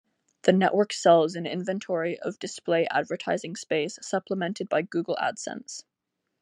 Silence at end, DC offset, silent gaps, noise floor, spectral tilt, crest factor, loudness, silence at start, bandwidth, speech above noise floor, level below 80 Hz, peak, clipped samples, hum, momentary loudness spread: 0.6 s; under 0.1%; none; -82 dBFS; -5 dB/octave; 20 dB; -26 LUFS; 0.45 s; 10.5 kHz; 56 dB; -78 dBFS; -6 dBFS; under 0.1%; none; 13 LU